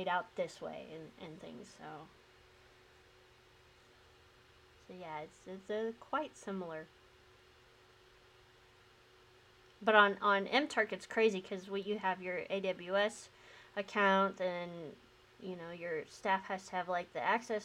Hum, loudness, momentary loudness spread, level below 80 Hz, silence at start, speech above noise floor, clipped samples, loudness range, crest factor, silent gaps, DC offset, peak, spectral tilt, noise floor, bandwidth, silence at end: none; -36 LUFS; 21 LU; -76 dBFS; 0 s; 28 dB; under 0.1%; 21 LU; 26 dB; none; under 0.1%; -12 dBFS; -4.5 dB/octave; -64 dBFS; 13.5 kHz; 0 s